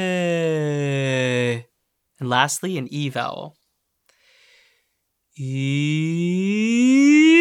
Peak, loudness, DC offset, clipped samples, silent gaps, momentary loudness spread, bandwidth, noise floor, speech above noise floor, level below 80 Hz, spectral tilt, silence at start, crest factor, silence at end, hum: -2 dBFS; -20 LUFS; under 0.1%; under 0.1%; none; 15 LU; 15.5 kHz; -73 dBFS; 53 dB; -74 dBFS; -5.5 dB/octave; 0 s; 20 dB; 0 s; none